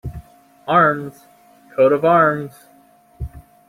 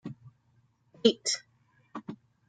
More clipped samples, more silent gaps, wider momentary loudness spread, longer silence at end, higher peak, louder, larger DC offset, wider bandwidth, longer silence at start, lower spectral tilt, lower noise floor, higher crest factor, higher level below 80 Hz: neither; neither; about the same, 21 LU vs 21 LU; about the same, 0.3 s vs 0.35 s; first, -2 dBFS vs -6 dBFS; first, -16 LUFS vs -28 LUFS; neither; first, 16 kHz vs 9.4 kHz; about the same, 0.05 s vs 0.05 s; first, -7.5 dB/octave vs -3 dB/octave; second, -52 dBFS vs -68 dBFS; second, 18 dB vs 28 dB; first, -42 dBFS vs -78 dBFS